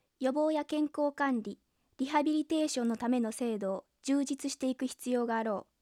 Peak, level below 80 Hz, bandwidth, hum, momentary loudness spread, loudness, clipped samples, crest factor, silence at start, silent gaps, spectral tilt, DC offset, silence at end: -16 dBFS; -78 dBFS; 14.5 kHz; none; 6 LU; -33 LUFS; under 0.1%; 16 dB; 0.2 s; none; -4 dB/octave; under 0.1%; 0.2 s